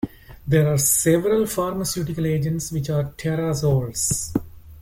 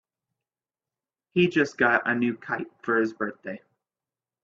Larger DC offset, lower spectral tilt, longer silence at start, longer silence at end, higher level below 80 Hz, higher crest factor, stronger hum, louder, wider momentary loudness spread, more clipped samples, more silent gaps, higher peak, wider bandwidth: neither; about the same, -5 dB/octave vs -6 dB/octave; second, 0.05 s vs 1.35 s; second, 0 s vs 0.9 s; first, -44 dBFS vs -68 dBFS; about the same, 16 dB vs 20 dB; neither; first, -21 LUFS vs -25 LUFS; second, 9 LU vs 14 LU; neither; neither; about the same, -6 dBFS vs -8 dBFS; first, 17 kHz vs 7.4 kHz